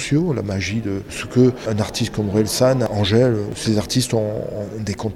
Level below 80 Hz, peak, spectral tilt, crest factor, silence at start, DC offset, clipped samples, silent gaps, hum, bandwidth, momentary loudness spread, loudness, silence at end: -44 dBFS; -4 dBFS; -5.5 dB/octave; 16 dB; 0 s; under 0.1%; under 0.1%; none; none; 16 kHz; 9 LU; -20 LUFS; 0 s